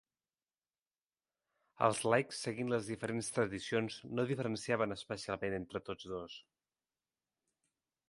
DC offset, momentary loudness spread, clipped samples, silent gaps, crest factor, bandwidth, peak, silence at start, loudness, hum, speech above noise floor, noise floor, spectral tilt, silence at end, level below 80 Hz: under 0.1%; 11 LU; under 0.1%; none; 24 dB; 11.5 kHz; -14 dBFS; 1.8 s; -37 LUFS; none; over 53 dB; under -90 dBFS; -5 dB/octave; 1.65 s; -70 dBFS